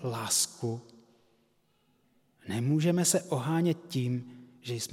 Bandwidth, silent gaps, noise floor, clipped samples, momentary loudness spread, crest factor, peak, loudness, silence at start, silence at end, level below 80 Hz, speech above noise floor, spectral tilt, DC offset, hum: 16.5 kHz; none; -70 dBFS; under 0.1%; 16 LU; 18 dB; -14 dBFS; -30 LUFS; 0 s; 0 s; -78 dBFS; 40 dB; -4.5 dB/octave; under 0.1%; none